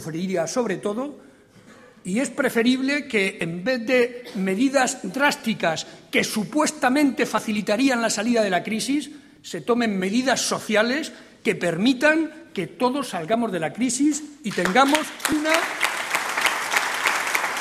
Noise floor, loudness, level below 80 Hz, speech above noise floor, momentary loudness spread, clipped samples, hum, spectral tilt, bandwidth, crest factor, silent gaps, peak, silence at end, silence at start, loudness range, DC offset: -50 dBFS; -22 LUFS; -64 dBFS; 27 dB; 8 LU; under 0.1%; none; -3.5 dB/octave; 15 kHz; 20 dB; none; -2 dBFS; 0 s; 0 s; 2 LU; under 0.1%